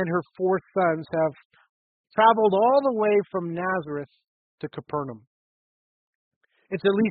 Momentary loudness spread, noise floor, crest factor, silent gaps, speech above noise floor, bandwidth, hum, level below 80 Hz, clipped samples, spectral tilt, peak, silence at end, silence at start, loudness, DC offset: 16 LU; under -90 dBFS; 18 dB; 1.45-1.50 s, 1.69-2.04 s, 4.28-4.58 s, 5.27-6.41 s; over 67 dB; 4.7 kHz; none; -68 dBFS; under 0.1%; -5 dB/octave; -6 dBFS; 0 s; 0 s; -24 LUFS; under 0.1%